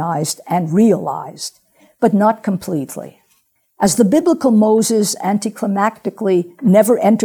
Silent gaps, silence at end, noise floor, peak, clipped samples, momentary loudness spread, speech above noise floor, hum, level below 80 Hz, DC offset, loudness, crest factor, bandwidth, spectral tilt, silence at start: none; 0 s; -61 dBFS; 0 dBFS; under 0.1%; 12 LU; 46 dB; none; -58 dBFS; under 0.1%; -15 LUFS; 16 dB; 19.5 kHz; -5.5 dB/octave; 0 s